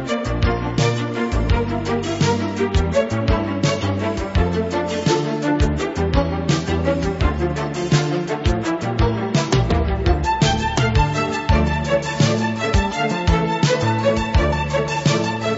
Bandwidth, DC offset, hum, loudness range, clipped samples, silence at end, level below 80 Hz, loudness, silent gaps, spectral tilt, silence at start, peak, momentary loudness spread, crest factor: 8 kHz; under 0.1%; none; 2 LU; under 0.1%; 0 s; -26 dBFS; -20 LUFS; none; -6 dB/octave; 0 s; -4 dBFS; 4 LU; 16 dB